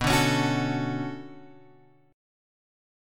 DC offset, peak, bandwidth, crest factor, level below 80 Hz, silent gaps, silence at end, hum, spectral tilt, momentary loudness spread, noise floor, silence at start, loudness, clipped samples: under 0.1%; -10 dBFS; 17.5 kHz; 20 dB; -48 dBFS; none; 0.95 s; none; -5 dB/octave; 19 LU; -57 dBFS; 0 s; -26 LUFS; under 0.1%